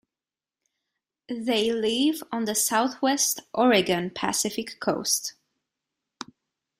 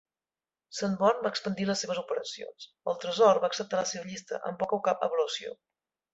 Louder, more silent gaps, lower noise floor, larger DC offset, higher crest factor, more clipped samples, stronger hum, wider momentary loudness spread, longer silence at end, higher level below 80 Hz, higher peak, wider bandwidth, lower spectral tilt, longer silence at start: first, -24 LUFS vs -29 LUFS; neither; about the same, under -90 dBFS vs under -90 dBFS; neither; about the same, 18 dB vs 22 dB; neither; neither; about the same, 15 LU vs 15 LU; first, 1.5 s vs 0.6 s; first, -68 dBFS vs -74 dBFS; about the same, -8 dBFS vs -8 dBFS; first, 16 kHz vs 8.2 kHz; second, -2.5 dB/octave vs -4 dB/octave; first, 1.3 s vs 0.7 s